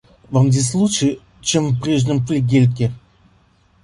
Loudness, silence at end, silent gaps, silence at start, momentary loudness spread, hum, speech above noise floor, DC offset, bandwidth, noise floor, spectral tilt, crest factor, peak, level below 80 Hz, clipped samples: -17 LUFS; 0.85 s; none; 0.3 s; 7 LU; none; 39 dB; under 0.1%; 11.5 kHz; -55 dBFS; -5.5 dB/octave; 14 dB; -2 dBFS; -48 dBFS; under 0.1%